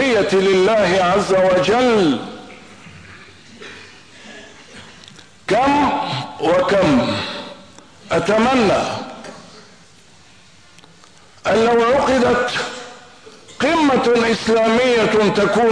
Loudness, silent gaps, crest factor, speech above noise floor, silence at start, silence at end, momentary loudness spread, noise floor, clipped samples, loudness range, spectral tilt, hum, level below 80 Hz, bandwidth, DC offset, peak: -16 LUFS; none; 10 dB; 33 dB; 0 s; 0 s; 22 LU; -48 dBFS; under 0.1%; 7 LU; -5 dB/octave; none; -48 dBFS; 10.5 kHz; 0.3%; -6 dBFS